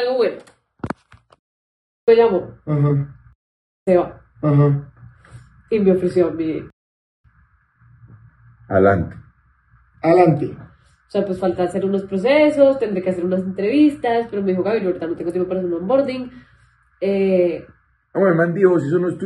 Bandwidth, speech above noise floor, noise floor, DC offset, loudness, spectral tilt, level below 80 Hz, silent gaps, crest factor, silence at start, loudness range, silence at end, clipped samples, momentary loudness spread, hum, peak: 10.5 kHz; 40 dB; -57 dBFS; under 0.1%; -18 LUFS; -8.5 dB/octave; -54 dBFS; 1.39-2.07 s, 3.35-3.86 s, 6.73-7.24 s; 18 dB; 0 s; 5 LU; 0 s; under 0.1%; 14 LU; none; -2 dBFS